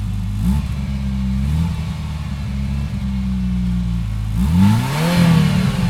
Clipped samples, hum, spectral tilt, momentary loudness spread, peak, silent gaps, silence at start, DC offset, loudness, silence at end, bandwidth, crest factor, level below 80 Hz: under 0.1%; none; -7 dB/octave; 10 LU; -2 dBFS; none; 0 s; under 0.1%; -19 LUFS; 0 s; 16 kHz; 16 dB; -24 dBFS